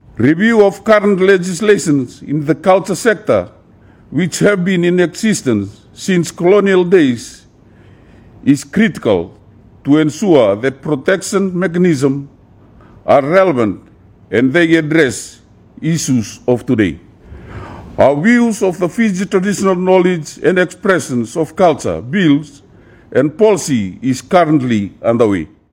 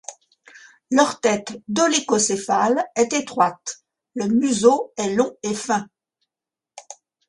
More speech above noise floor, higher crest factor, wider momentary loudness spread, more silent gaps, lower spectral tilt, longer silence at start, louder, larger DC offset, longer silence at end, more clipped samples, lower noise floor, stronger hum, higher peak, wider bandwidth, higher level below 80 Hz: second, 31 dB vs 69 dB; second, 14 dB vs 20 dB; second, 9 LU vs 16 LU; neither; first, -6 dB/octave vs -3.5 dB/octave; about the same, 0.15 s vs 0.1 s; first, -13 LUFS vs -20 LUFS; neither; about the same, 0.25 s vs 0.35 s; first, 0.2% vs under 0.1%; second, -44 dBFS vs -89 dBFS; neither; about the same, 0 dBFS vs -2 dBFS; first, 16.5 kHz vs 11.5 kHz; first, -48 dBFS vs -64 dBFS